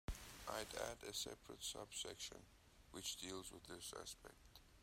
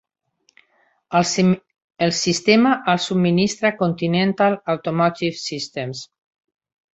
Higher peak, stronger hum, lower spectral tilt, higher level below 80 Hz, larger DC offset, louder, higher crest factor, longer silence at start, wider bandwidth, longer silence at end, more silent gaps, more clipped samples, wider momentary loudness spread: second, -30 dBFS vs -2 dBFS; neither; second, -2 dB/octave vs -5 dB/octave; second, -64 dBFS vs -58 dBFS; neither; second, -50 LUFS vs -19 LUFS; about the same, 22 dB vs 18 dB; second, 0.1 s vs 1.1 s; first, 16 kHz vs 8.2 kHz; second, 0 s vs 0.9 s; second, none vs 1.84-1.88 s; neither; first, 15 LU vs 11 LU